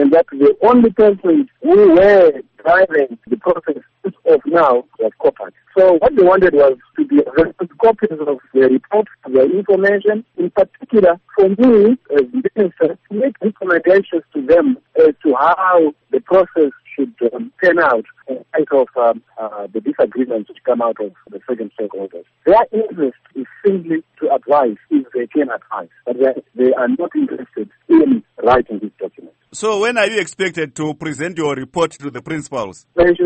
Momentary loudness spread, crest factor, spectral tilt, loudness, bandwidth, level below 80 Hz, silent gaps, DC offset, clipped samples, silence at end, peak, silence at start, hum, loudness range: 14 LU; 12 dB; -6 dB/octave; -15 LUFS; 8.4 kHz; -48 dBFS; none; under 0.1%; under 0.1%; 0 s; -2 dBFS; 0 s; none; 6 LU